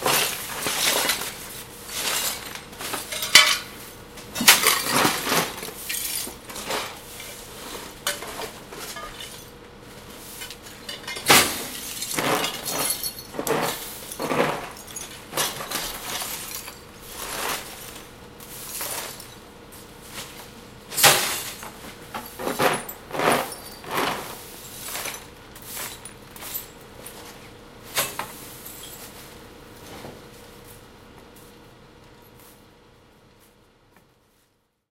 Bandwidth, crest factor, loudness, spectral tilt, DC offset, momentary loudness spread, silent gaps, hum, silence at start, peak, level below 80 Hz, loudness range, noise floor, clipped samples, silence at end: 17 kHz; 28 dB; -23 LUFS; -1 dB/octave; under 0.1%; 24 LU; none; none; 0 s; 0 dBFS; -54 dBFS; 15 LU; -67 dBFS; under 0.1%; 2.2 s